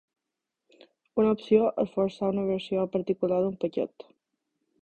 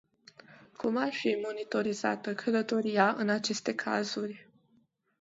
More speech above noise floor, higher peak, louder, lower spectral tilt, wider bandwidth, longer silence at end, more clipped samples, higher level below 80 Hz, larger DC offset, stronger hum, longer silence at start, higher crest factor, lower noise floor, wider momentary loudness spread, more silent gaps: first, 60 dB vs 39 dB; about the same, -10 dBFS vs -10 dBFS; first, -27 LUFS vs -31 LUFS; first, -8.5 dB/octave vs -4.5 dB/octave; about the same, 8.4 kHz vs 8 kHz; first, 0.95 s vs 0.8 s; neither; first, -66 dBFS vs -78 dBFS; neither; neither; first, 1.15 s vs 0.5 s; about the same, 20 dB vs 22 dB; first, -86 dBFS vs -70 dBFS; about the same, 8 LU vs 8 LU; neither